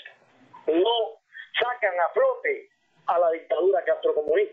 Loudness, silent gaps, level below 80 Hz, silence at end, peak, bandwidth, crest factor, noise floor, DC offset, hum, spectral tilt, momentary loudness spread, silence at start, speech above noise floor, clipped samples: -25 LUFS; none; -74 dBFS; 0 s; -10 dBFS; 4.2 kHz; 14 dB; -53 dBFS; under 0.1%; none; -5.5 dB/octave; 10 LU; 0.05 s; 30 dB; under 0.1%